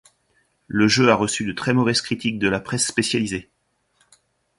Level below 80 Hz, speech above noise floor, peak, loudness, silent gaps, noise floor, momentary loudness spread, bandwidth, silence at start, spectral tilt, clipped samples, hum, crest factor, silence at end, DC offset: -54 dBFS; 46 dB; -2 dBFS; -20 LUFS; none; -66 dBFS; 9 LU; 11.5 kHz; 0.7 s; -4 dB/octave; under 0.1%; none; 20 dB; 1.15 s; under 0.1%